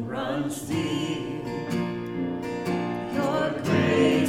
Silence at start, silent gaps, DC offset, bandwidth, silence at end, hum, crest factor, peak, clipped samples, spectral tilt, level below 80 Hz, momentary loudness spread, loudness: 0 s; none; under 0.1%; 16 kHz; 0 s; none; 16 dB; -10 dBFS; under 0.1%; -6 dB/octave; -54 dBFS; 8 LU; -27 LUFS